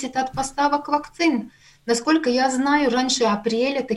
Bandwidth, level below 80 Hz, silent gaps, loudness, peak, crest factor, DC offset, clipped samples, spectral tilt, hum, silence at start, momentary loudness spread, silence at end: 12 kHz; -52 dBFS; none; -21 LUFS; -6 dBFS; 16 dB; under 0.1%; under 0.1%; -3.5 dB/octave; none; 0 s; 6 LU; 0 s